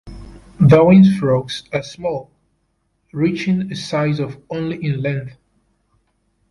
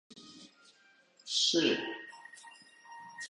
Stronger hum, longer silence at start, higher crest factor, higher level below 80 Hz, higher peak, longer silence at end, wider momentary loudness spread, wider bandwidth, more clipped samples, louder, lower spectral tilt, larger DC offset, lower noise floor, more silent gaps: neither; about the same, 0.05 s vs 0.15 s; second, 16 dB vs 22 dB; first, -46 dBFS vs -84 dBFS; first, -2 dBFS vs -16 dBFS; first, 1.2 s vs 0.05 s; second, 16 LU vs 26 LU; about the same, 11.5 kHz vs 11.5 kHz; neither; first, -17 LUFS vs -30 LUFS; first, -8 dB/octave vs -2 dB/octave; neither; about the same, -66 dBFS vs -65 dBFS; neither